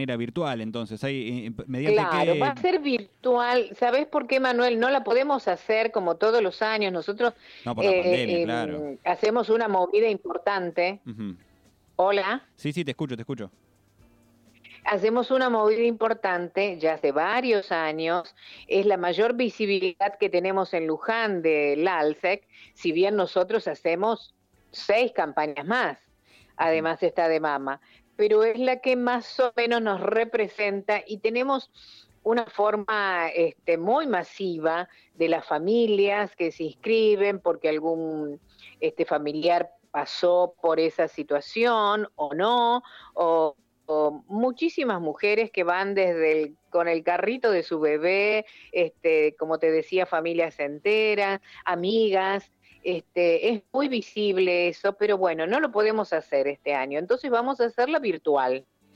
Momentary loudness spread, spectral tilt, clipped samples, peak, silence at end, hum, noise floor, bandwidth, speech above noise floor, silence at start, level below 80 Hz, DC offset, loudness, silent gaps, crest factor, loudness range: 8 LU; -6 dB/octave; under 0.1%; -10 dBFS; 0.35 s; none; -61 dBFS; 9 kHz; 36 dB; 0 s; -70 dBFS; under 0.1%; -25 LUFS; none; 16 dB; 3 LU